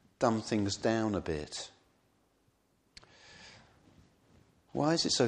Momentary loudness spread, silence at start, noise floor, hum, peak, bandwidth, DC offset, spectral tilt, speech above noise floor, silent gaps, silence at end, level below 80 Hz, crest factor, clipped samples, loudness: 23 LU; 0.2 s; -72 dBFS; none; -12 dBFS; 10.5 kHz; under 0.1%; -4.5 dB/octave; 41 dB; none; 0 s; -60 dBFS; 22 dB; under 0.1%; -33 LUFS